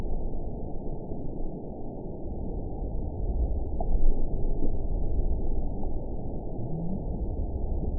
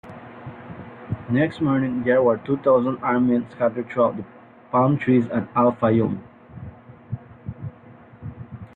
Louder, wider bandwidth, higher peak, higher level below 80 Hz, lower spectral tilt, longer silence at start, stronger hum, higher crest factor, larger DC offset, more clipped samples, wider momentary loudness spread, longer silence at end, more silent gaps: second, -35 LUFS vs -21 LUFS; second, 1 kHz vs 4.5 kHz; second, -10 dBFS vs -6 dBFS; first, -28 dBFS vs -56 dBFS; first, -17.5 dB/octave vs -10 dB/octave; about the same, 0 s vs 0.05 s; neither; about the same, 16 dB vs 16 dB; first, 0.6% vs under 0.1%; neither; second, 7 LU vs 20 LU; about the same, 0 s vs 0.1 s; neither